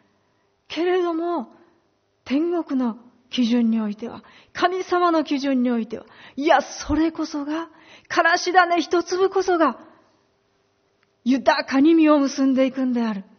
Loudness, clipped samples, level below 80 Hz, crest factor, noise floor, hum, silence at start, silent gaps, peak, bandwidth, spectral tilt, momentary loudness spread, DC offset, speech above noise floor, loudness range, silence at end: -21 LUFS; under 0.1%; -52 dBFS; 20 dB; -66 dBFS; none; 0.7 s; none; -2 dBFS; 6.6 kHz; -2.5 dB/octave; 16 LU; under 0.1%; 45 dB; 4 LU; 0.15 s